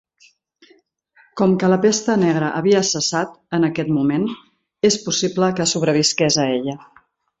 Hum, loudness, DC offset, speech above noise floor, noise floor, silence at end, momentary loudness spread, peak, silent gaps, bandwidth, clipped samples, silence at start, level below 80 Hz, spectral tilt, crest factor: none; -18 LUFS; under 0.1%; 38 dB; -56 dBFS; 0.65 s; 8 LU; -4 dBFS; none; 8.2 kHz; under 0.1%; 1.35 s; -58 dBFS; -4 dB/octave; 16 dB